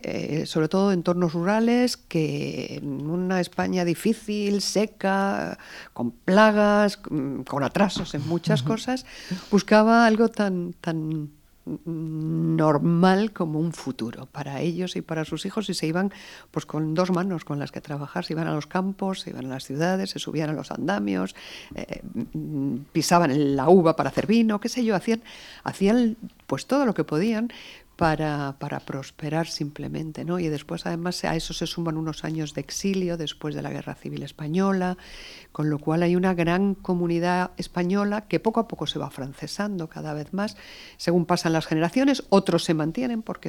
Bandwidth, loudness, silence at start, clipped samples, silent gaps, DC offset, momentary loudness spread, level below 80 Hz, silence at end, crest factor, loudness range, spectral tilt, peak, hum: 18.5 kHz; -25 LUFS; 0 s; under 0.1%; none; under 0.1%; 13 LU; -52 dBFS; 0 s; 22 dB; 6 LU; -6 dB/octave; -4 dBFS; none